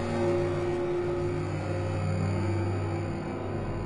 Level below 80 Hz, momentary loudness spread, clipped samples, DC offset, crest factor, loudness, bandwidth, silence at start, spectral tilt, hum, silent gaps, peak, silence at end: -48 dBFS; 6 LU; under 0.1%; under 0.1%; 14 dB; -30 LUFS; 10.5 kHz; 0 s; -8 dB/octave; none; none; -16 dBFS; 0 s